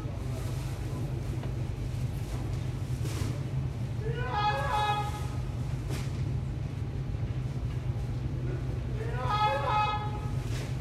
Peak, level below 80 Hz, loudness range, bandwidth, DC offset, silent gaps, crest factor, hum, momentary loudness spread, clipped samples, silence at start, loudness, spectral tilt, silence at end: -14 dBFS; -40 dBFS; 3 LU; 14 kHz; under 0.1%; none; 16 dB; none; 7 LU; under 0.1%; 0 s; -33 LUFS; -6.5 dB/octave; 0 s